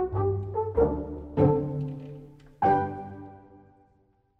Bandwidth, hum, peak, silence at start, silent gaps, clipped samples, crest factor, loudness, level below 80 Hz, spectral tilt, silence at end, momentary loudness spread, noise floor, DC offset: 5.2 kHz; none; -8 dBFS; 0 s; none; under 0.1%; 20 dB; -27 LUFS; -46 dBFS; -11 dB/octave; 0.8 s; 20 LU; -66 dBFS; under 0.1%